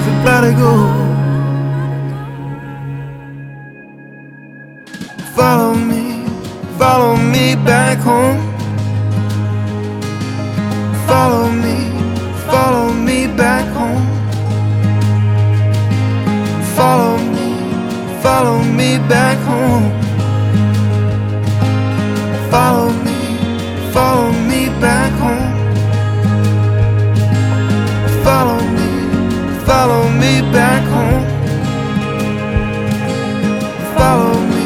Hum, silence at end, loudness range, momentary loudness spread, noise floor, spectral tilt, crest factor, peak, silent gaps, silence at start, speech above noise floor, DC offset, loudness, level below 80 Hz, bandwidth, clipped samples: none; 0 s; 4 LU; 9 LU; -35 dBFS; -6.5 dB/octave; 14 dB; 0 dBFS; none; 0 s; 26 dB; under 0.1%; -14 LUFS; -32 dBFS; 16 kHz; under 0.1%